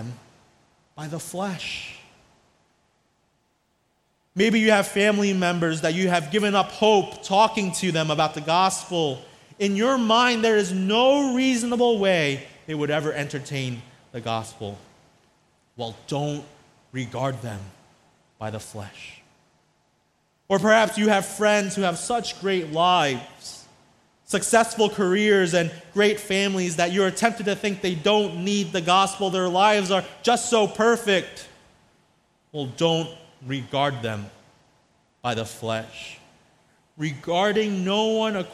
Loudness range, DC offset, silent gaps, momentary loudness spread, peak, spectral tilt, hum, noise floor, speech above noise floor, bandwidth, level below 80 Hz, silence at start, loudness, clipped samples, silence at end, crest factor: 12 LU; under 0.1%; none; 17 LU; -4 dBFS; -4 dB/octave; none; -69 dBFS; 46 dB; 14.5 kHz; -62 dBFS; 0 s; -22 LUFS; under 0.1%; 0 s; 20 dB